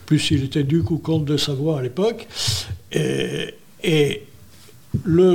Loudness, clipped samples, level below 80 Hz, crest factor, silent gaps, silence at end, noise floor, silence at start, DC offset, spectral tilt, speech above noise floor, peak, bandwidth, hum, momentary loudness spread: -21 LUFS; under 0.1%; -50 dBFS; 16 dB; none; 0 s; -48 dBFS; 0 s; under 0.1%; -5.5 dB/octave; 28 dB; -6 dBFS; 17 kHz; none; 8 LU